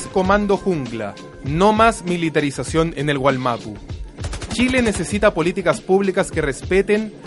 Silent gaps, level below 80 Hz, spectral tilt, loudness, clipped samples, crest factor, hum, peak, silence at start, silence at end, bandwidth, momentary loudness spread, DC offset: none; -36 dBFS; -5.5 dB/octave; -19 LUFS; under 0.1%; 18 dB; none; -2 dBFS; 0 s; 0 s; 11.5 kHz; 13 LU; under 0.1%